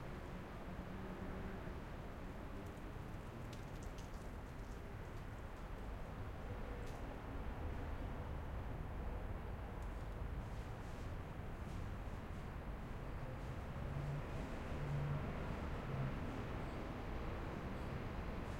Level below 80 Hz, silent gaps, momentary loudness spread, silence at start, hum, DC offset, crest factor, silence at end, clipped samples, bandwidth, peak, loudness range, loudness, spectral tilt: -50 dBFS; none; 7 LU; 0 s; none; under 0.1%; 16 dB; 0 s; under 0.1%; 16 kHz; -30 dBFS; 6 LU; -48 LUFS; -7 dB/octave